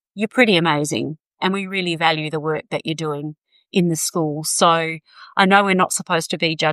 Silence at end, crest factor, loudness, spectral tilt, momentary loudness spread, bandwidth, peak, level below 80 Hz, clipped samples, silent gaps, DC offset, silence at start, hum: 0 s; 18 dB; -19 LUFS; -4 dB/octave; 11 LU; 15 kHz; -2 dBFS; -68 dBFS; under 0.1%; none; under 0.1%; 0.15 s; none